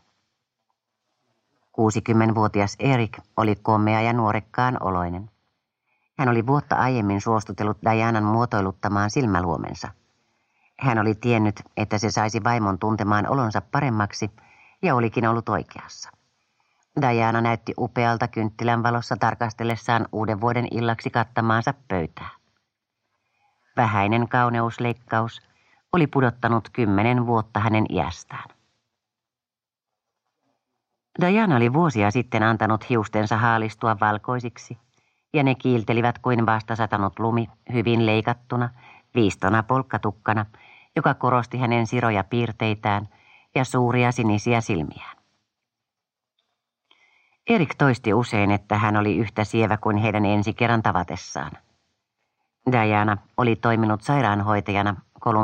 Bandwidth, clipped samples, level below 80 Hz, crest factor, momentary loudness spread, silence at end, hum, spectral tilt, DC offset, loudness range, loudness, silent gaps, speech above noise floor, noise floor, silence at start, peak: 9 kHz; under 0.1%; -56 dBFS; 20 dB; 9 LU; 0 s; none; -7 dB/octave; under 0.1%; 4 LU; -22 LUFS; none; over 68 dB; under -90 dBFS; 1.8 s; -4 dBFS